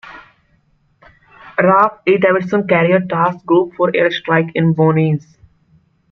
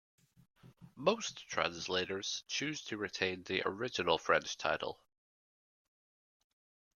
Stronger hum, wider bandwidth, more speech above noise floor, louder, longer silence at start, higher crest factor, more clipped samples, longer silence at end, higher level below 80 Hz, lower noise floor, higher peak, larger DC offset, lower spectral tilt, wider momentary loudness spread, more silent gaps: neither; second, 6.2 kHz vs 13 kHz; second, 44 dB vs over 54 dB; first, -14 LUFS vs -36 LUFS; second, 0.05 s vs 0.65 s; second, 14 dB vs 26 dB; neither; second, 0.9 s vs 2 s; first, -58 dBFS vs -74 dBFS; second, -58 dBFS vs under -90 dBFS; first, -2 dBFS vs -14 dBFS; neither; first, -8.5 dB/octave vs -3 dB/octave; second, 4 LU vs 7 LU; neither